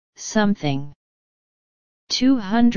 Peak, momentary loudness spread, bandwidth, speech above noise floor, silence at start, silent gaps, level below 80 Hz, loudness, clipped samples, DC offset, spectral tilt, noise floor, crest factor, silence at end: -4 dBFS; 10 LU; 7.4 kHz; over 71 dB; 0.1 s; 0.96-2.07 s; -48 dBFS; -21 LUFS; under 0.1%; 2%; -5 dB/octave; under -90 dBFS; 18 dB; 0 s